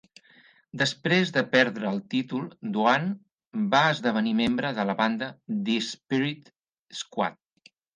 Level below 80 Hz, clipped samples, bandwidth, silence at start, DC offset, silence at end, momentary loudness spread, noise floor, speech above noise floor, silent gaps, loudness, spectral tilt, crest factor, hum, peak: -66 dBFS; under 0.1%; 9.8 kHz; 0.75 s; under 0.1%; 0.6 s; 12 LU; -61 dBFS; 35 dB; 3.47-3.51 s, 6.79-6.86 s; -26 LUFS; -5 dB/octave; 22 dB; none; -6 dBFS